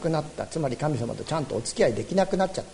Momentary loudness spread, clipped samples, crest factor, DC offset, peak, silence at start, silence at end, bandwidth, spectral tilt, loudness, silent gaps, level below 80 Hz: 6 LU; under 0.1%; 18 dB; under 0.1%; -8 dBFS; 0 s; 0 s; 11 kHz; -5.5 dB/octave; -27 LUFS; none; -50 dBFS